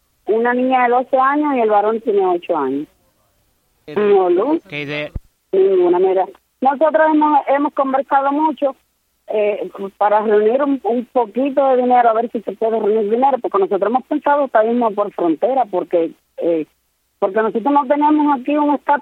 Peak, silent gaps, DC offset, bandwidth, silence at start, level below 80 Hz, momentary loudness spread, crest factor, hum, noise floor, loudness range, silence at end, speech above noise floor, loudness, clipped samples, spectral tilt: -2 dBFS; none; under 0.1%; 5 kHz; 0.25 s; -50 dBFS; 9 LU; 14 dB; none; -61 dBFS; 3 LU; 0 s; 46 dB; -16 LUFS; under 0.1%; -8 dB/octave